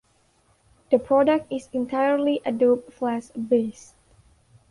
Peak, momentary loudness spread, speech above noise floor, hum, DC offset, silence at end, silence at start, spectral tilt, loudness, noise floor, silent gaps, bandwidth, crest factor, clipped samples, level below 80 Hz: -6 dBFS; 9 LU; 41 dB; none; under 0.1%; 1 s; 0.9 s; -6 dB/octave; -23 LUFS; -63 dBFS; none; 11.5 kHz; 18 dB; under 0.1%; -62 dBFS